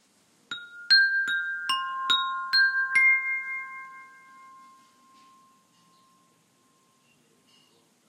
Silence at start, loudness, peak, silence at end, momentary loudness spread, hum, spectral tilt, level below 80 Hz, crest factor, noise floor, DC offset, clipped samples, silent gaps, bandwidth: 0.5 s; -23 LUFS; -8 dBFS; 4 s; 20 LU; none; 2 dB/octave; -88 dBFS; 20 dB; -65 dBFS; under 0.1%; under 0.1%; none; 16 kHz